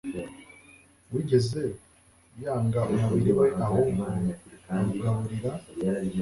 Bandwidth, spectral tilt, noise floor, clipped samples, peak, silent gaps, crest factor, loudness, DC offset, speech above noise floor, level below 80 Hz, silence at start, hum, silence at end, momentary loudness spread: 11.5 kHz; -8 dB/octave; -59 dBFS; under 0.1%; -10 dBFS; none; 18 dB; -27 LUFS; under 0.1%; 33 dB; -52 dBFS; 0.05 s; none; 0 s; 14 LU